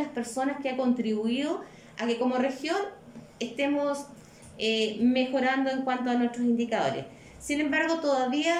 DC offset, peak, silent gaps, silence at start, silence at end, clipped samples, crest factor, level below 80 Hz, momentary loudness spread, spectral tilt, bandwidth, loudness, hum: under 0.1%; -14 dBFS; none; 0 s; 0 s; under 0.1%; 14 dB; -64 dBFS; 11 LU; -4 dB/octave; 12.5 kHz; -28 LUFS; none